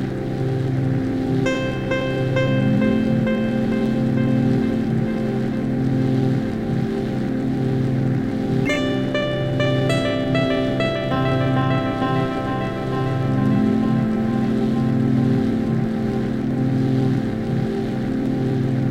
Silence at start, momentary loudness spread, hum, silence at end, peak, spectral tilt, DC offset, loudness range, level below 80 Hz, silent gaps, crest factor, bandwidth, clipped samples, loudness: 0 s; 4 LU; none; 0 s; -8 dBFS; -8 dB/octave; under 0.1%; 2 LU; -40 dBFS; none; 12 dB; 9.2 kHz; under 0.1%; -21 LUFS